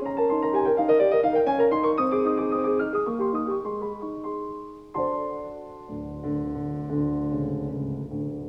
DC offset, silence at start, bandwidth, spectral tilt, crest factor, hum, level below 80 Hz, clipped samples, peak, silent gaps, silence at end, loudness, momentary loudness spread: under 0.1%; 0 s; 5.4 kHz; -10 dB/octave; 16 dB; none; -50 dBFS; under 0.1%; -10 dBFS; none; 0 s; -25 LUFS; 14 LU